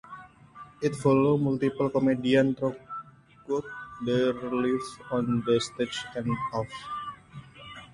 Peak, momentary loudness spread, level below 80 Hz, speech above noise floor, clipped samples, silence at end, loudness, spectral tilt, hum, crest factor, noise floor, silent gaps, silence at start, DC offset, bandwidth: -10 dBFS; 21 LU; -60 dBFS; 23 dB; under 0.1%; 0.1 s; -28 LUFS; -6.5 dB/octave; none; 18 dB; -50 dBFS; none; 0.05 s; under 0.1%; 11.5 kHz